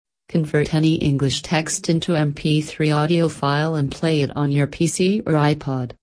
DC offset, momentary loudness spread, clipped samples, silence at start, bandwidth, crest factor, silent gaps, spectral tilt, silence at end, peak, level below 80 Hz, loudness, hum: under 0.1%; 3 LU; under 0.1%; 0.3 s; 11 kHz; 14 dB; none; -5.5 dB/octave; 0.1 s; -4 dBFS; -48 dBFS; -20 LUFS; none